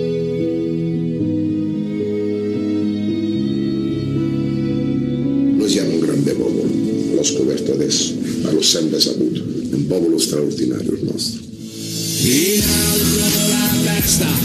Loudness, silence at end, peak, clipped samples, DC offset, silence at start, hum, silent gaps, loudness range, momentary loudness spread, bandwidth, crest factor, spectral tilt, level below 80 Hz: -17 LUFS; 0 s; 0 dBFS; under 0.1%; under 0.1%; 0 s; none; none; 4 LU; 7 LU; 15 kHz; 18 dB; -4 dB/octave; -40 dBFS